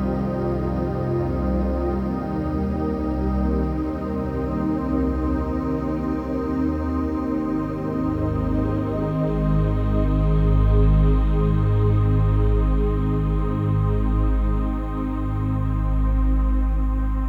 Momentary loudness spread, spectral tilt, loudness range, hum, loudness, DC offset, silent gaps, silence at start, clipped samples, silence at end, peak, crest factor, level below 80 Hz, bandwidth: 6 LU; -10.5 dB/octave; 4 LU; none; -23 LUFS; under 0.1%; none; 0 s; under 0.1%; 0 s; -8 dBFS; 14 dB; -24 dBFS; 4.5 kHz